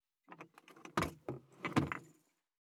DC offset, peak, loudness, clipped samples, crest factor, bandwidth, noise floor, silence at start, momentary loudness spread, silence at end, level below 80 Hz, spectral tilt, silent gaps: under 0.1%; -18 dBFS; -40 LUFS; under 0.1%; 24 dB; 16.5 kHz; -72 dBFS; 0.3 s; 20 LU; 0.6 s; -66 dBFS; -5.5 dB/octave; none